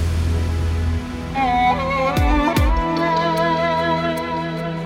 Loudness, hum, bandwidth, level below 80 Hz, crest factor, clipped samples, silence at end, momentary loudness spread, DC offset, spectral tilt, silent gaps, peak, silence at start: -19 LUFS; none; 16.5 kHz; -26 dBFS; 14 dB; under 0.1%; 0 s; 7 LU; under 0.1%; -6.5 dB/octave; none; -4 dBFS; 0 s